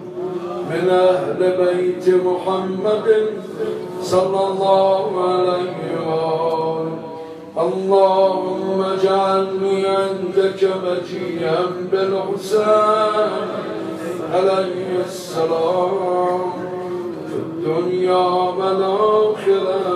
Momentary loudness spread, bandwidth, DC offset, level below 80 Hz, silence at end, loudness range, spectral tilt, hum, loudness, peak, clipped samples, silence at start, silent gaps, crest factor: 11 LU; 12.5 kHz; under 0.1%; -70 dBFS; 0 s; 3 LU; -6 dB/octave; none; -19 LUFS; -2 dBFS; under 0.1%; 0 s; none; 16 dB